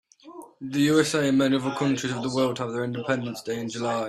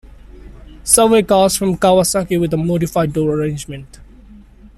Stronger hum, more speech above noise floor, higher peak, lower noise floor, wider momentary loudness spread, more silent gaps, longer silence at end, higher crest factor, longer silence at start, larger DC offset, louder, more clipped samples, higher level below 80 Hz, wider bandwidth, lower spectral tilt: neither; second, 21 dB vs 26 dB; second, -8 dBFS vs 0 dBFS; first, -46 dBFS vs -41 dBFS; second, 10 LU vs 15 LU; neither; about the same, 0 s vs 0.1 s; about the same, 18 dB vs 16 dB; second, 0.25 s vs 0.45 s; neither; second, -25 LUFS vs -14 LUFS; neither; second, -64 dBFS vs -38 dBFS; about the same, 14 kHz vs 14.5 kHz; about the same, -5 dB/octave vs -4.5 dB/octave